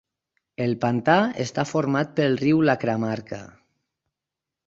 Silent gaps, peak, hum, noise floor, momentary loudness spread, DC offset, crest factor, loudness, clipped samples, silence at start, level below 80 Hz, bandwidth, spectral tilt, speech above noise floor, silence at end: none; -2 dBFS; none; -87 dBFS; 12 LU; under 0.1%; 22 dB; -23 LUFS; under 0.1%; 0.6 s; -60 dBFS; 7.8 kHz; -6.5 dB/octave; 65 dB; 1.15 s